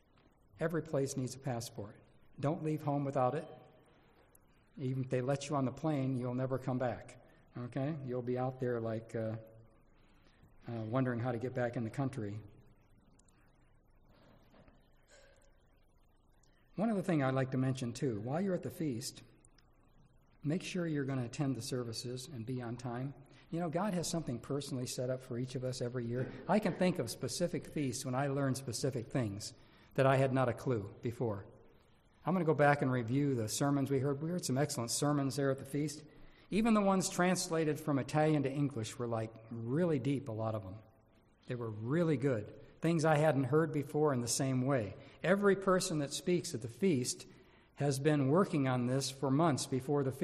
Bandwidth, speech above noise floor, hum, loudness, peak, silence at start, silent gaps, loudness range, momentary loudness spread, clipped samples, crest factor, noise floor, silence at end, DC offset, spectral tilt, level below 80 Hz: 14 kHz; 33 dB; none; -35 LUFS; -16 dBFS; 0.6 s; none; 7 LU; 12 LU; under 0.1%; 20 dB; -67 dBFS; 0 s; under 0.1%; -6 dB/octave; -66 dBFS